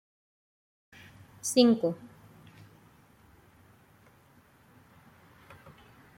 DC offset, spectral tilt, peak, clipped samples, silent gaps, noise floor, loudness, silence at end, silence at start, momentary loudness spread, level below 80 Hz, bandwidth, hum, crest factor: under 0.1%; -4.5 dB/octave; -10 dBFS; under 0.1%; none; -61 dBFS; -26 LUFS; 4.1 s; 1.45 s; 30 LU; -72 dBFS; 16.5 kHz; none; 26 dB